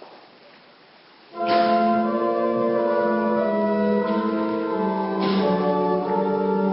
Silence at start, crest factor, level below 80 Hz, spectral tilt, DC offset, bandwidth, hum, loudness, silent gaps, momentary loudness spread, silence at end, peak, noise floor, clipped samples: 0 s; 14 dB; -62 dBFS; -11.5 dB/octave; under 0.1%; 5.8 kHz; none; -22 LUFS; none; 4 LU; 0 s; -8 dBFS; -51 dBFS; under 0.1%